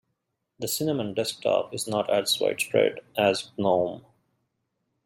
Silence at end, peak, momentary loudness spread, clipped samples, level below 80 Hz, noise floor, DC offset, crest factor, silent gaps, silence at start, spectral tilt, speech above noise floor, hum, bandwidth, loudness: 1.05 s; -6 dBFS; 6 LU; under 0.1%; -70 dBFS; -79 dBFS; under 0.1%; 20 dB; none; 0.6 s; -3.5 dB/octave; 54 dB; none; 16.5 kHz; -26 LUFS